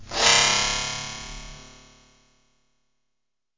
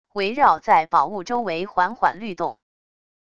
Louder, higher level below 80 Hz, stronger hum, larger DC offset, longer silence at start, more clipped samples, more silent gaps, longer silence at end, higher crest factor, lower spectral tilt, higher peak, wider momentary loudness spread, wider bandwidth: about the same, -19 LUFS vs -21 LUFS; first, -46 dBFS vs -60 dBFS; neither; second, under 0.1% vs 0.4%; second, 0 s vs 0.15 s; neither; neither; first, 1.9 s vs 0.8 s; about the same, 22 dB vs 18 dB; second, 0 dB/octave vs -5 dB/octave; about the same, -4 dBFS vs -4 dBFS; first, 23 LU vs 11 LU; about the same, 7.8 kHz vs 7.4 kHz